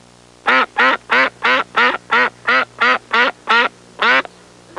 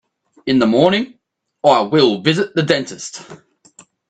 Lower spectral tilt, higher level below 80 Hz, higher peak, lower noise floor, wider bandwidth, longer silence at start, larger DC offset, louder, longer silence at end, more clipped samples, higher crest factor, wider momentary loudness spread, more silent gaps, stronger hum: second, -2 dB/octave vs -5 dB/octave; about the same, -60 dBFS vs -58 dBFS; about the same, -2 dBFS vs 0 dBFS; second, -43 dBFS vs -49 dBFS; first, 11.5 kHz vs 9.4 kHz; about the same, 0.45 s vs 0.45 s; neither; about the same, -14 LUFS vs -15 LUFS; second, 0.55 s vs 0.75 s; neither; about the same, 14 dB vs 18 dB; second, 3 LU vs 17 LU; neither; first, 60 Hz at -50 dBFS vs none